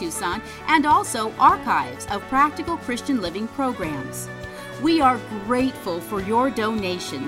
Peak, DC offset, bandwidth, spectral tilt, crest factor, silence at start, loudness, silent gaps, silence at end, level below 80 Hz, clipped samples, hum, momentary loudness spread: -4 dBFS; under 0.1%; 16.5 kHz; -4 dB/octave; 20 dB; 0 s; -22 LUFS; none; 0 s; -48 dBFS; under 0.1%; none; 12 LU